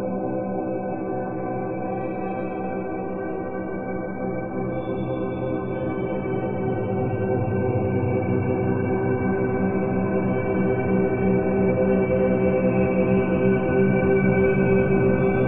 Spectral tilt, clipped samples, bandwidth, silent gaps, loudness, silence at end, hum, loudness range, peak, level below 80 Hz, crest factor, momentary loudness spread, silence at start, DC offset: -13 dB/octave; under 0.1%; 3.7 kHz; none; -23 LUFS; 0 s; none; 8 LU; -8 dBFS; -44 dBFS; 14 dB; 9 LU; 0 s; under 0.1%